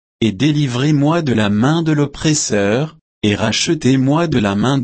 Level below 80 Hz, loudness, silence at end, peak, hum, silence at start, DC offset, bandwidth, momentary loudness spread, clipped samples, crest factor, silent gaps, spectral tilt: -44 dBFS; -15 LUFS; 0 s; -2 dBFS; none; 0.2 s; under 0.1%; 8.8 kHz; 4 LU; under 0.1%; 12 dB; 3.01-3.21 s; -5 dB/octave